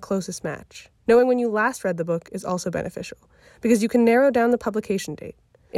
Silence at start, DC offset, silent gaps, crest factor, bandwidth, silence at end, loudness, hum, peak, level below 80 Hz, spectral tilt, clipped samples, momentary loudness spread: 0 s; under 0.1%; none; 16 dB; 14.5 kHz; 0 s; -22 LUFS; none; -6 dBFS; -58 dBFS; -5.5 dB/octave; under 0.1%; 17 LU